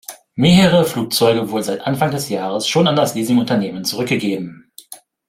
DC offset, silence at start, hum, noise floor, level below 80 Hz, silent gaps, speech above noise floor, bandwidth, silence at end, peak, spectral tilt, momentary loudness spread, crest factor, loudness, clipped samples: under 0.1%; 0.1 s; none; -41 dBFS; -50 dBFS; none; 25 dB; 16.5 kHz; 0.35 s; -2 dBFS; -5 dB/octave; 12 LU; 16 dB; -16 LUFS; under 0.1%